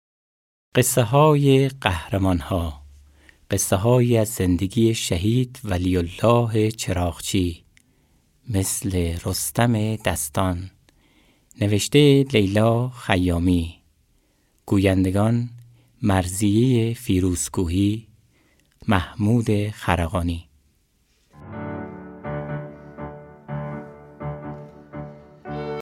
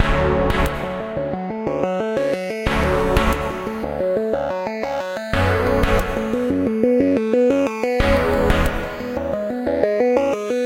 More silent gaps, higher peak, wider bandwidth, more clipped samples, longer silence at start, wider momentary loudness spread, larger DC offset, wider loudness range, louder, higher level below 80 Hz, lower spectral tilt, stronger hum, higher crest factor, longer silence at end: neither; about the same, 0 dBFS vs -2 dBFS; about the same, 17 kHz vs 17 kHz; neither; first, 0.75 s vs 0 s; first, 18 LU vs 8 LU; neither; first, 13 LU vs 3 LU; about the same, -21 LUFS vs -20 LUFS; second, -46 dBFS vs -28 dBFS; about the same, -5.5 dB/octave vs -6.5 dB/octave; neither; about the same, 22 dB vs 18 dB; about the same, 0 s vs 0 s